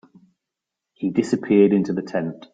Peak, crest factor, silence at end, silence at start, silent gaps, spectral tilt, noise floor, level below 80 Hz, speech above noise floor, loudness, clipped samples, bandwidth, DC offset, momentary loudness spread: -4 dBFS; 18 dB; 0.15 s; 1 s; none; -7.5 dB/octave; -85 dBFS; -64 dBFS; 65 dB; -20 LUFS; under 0.1%; 9.2 kHz; under 0.1%; 11 LU